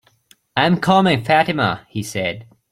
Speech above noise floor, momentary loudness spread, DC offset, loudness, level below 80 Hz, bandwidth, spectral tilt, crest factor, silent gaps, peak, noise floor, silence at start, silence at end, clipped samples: 38 dB; 11 LU; under 0.1%; -18 LUFS; -54 dBFS; 15 kHz; -5.5 dB/octave; 18 dB; none; 0 dBFS; -55 dBFS; 0.55 s; 0.3 s; under 0.1%